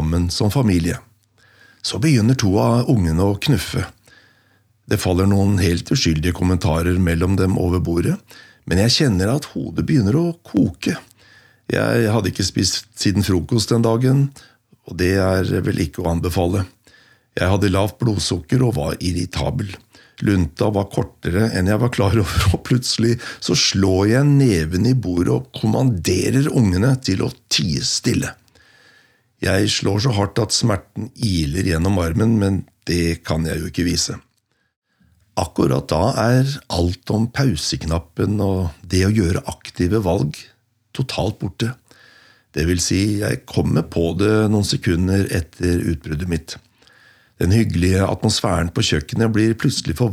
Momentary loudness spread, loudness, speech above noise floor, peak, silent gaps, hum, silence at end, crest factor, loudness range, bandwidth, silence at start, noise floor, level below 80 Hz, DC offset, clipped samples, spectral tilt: 8 LU; -19 LUFS; 41 dB; -4 dBFS; 34.76-34.82 s; none; 0 s; 14 dB; 4 LU; 15.5 kHz; 0 s; -58 dBFS; -40 dBFS; under 0.1%; under 0.1%; -5.5 dB/octave